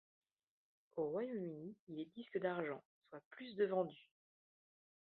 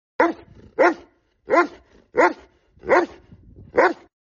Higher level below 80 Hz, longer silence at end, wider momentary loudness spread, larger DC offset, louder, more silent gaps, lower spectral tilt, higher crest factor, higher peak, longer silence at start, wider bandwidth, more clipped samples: second, -90 dBFS vs -56 dBFS; first, 1.1 s vs 0.4 s; about the same, 18 LU vs 17 LU; neither; second, -44 LUFS vs -21 LUFS; first, 1.80-1.87 s, 2.85-3.01 s, 3.25-3.31 s vs none; first, -5.5 dB/octave vs -3 dB/octave; about the same, 20 dB vs 16 dB; second, -26 dBFS vs -6 dBFS; first, 0.95 s vs 0.2 s; second, 4.4 kHz vs 7.2 kHz; neither